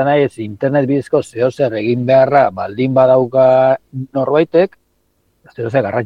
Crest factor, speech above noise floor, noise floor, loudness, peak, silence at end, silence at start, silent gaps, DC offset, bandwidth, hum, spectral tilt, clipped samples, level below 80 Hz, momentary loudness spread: 14 dB; 48 dB; -62 dBFS; -14 LUFS; 0 dBFS; 0 s; 0 s; none; under 0.1%; 10.5 kHz; none; -8 dB/octave; under 0.1%; -58 dBFS; 9 LU